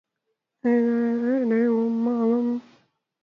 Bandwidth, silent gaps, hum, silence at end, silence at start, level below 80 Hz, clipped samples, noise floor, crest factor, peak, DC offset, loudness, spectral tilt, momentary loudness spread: 4.2 kHz; none; none; 0.6 s; 0.65 s; -76 dBFS; under 0.1%; -79 dBFS; 12 dB; -12 dBFS; under 0.1%; -23 LUFS; -9 dB/octave; 6 LU